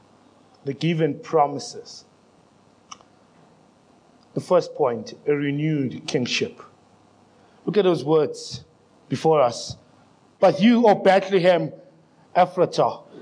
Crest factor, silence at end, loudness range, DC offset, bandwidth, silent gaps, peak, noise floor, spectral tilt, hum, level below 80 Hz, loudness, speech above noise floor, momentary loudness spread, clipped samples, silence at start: 18 dB; 0 s; 9 LU; under 0.1%; 10.5 kHz; none; -4 dBFS; -56 dBFS; -6 dB/octave; none; -70 dBFS; -21 LUFS; 35 dB; 17 LU; under 0.1%; 0.65 s